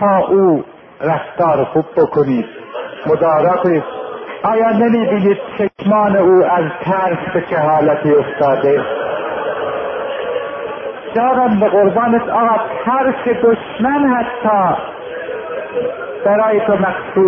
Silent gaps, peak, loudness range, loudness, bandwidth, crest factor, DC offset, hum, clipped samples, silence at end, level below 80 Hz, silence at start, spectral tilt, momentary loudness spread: none; 0 dBFS; 3 LU; -15 LUFS; 5.6 kHz; 14 dB; under 0.1%; none; under 0.1%; 0 s; -52 dBFS; 0 s; -10 dB/octave; 11 LU